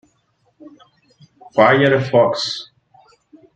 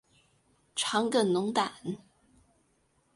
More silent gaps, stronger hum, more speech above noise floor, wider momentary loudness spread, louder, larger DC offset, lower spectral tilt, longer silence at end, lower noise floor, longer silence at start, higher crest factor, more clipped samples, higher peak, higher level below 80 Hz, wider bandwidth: neither; neither; first, 49 dB vs 42 dB; about the same, 11 LU vs 13 LU; first, -16 LUFS vs -30 LUFS; neither; first, -5.5 dB/octave vs -4 dB/octave; second, 0.95 s vs 1.2 s; second, -63 dBFS vs -71 dBFS; about the same, 0.65 s vs 0.75 s; about the same, 18 dB vs 20 dB; neither; first, -2 dBFS vs -14 dBFS; first, -62 dBFS vs -74 dBFS; second, 9 kHz vs 11.5 kHz